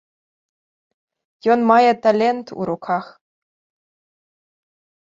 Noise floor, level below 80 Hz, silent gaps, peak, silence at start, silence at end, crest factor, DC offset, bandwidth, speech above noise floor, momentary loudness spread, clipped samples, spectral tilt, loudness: under -90 dBFS; -68 dBFS; none; -2 dBFS; 1.45 s; 2.05 s; 20 dB; under 0.1%; 7.6 kHz; over 73 dB; 12 LU; under 0.1%; -6.5 dB/octave; -18 LUFS